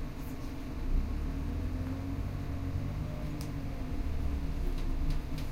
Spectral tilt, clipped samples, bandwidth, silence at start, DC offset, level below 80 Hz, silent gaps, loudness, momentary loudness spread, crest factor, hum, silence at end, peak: -7 dB/octave; under 0.1%; 15.5 kHz; 0 s; under 0.1%; -36 dBFS; none; -38 LUFS; 4 LU; 14 dB; none; 0 s; -20 dBFS